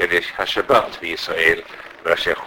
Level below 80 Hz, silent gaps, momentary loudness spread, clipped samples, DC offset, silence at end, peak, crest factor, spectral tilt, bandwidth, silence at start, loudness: -50 dBFS; none; 9 LU; under 0.1%; under 0.1%; 0 s; 0 dBFS; 20 dB; -3 dB/octave; 17 kHz; 0 s; -19 LUFS